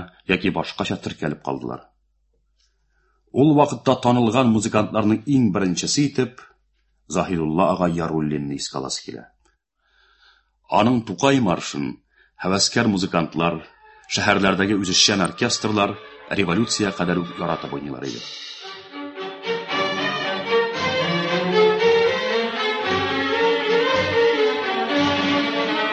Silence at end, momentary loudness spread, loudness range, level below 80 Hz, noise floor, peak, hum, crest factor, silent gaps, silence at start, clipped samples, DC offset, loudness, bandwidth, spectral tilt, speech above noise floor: 0 s; 12 LU; 6 LU; -52 dBFS; -66 dBFS; -2 dBFS; none; 20 dB; none; 0 s; under 0.1%; under 0.1%; -20 LUFS; 9.2 kHz; -4.5 dB/octave; 45 dB